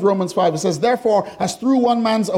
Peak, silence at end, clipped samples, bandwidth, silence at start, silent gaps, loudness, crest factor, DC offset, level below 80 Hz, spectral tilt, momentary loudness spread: -6 dBFS; 0 s; under 0.1%; 15.5 kHz; 0 s; none; -18 LUFS; 12 dB; under 0.1%; -60 dBFS; -5.5 dB/octave; 3 LU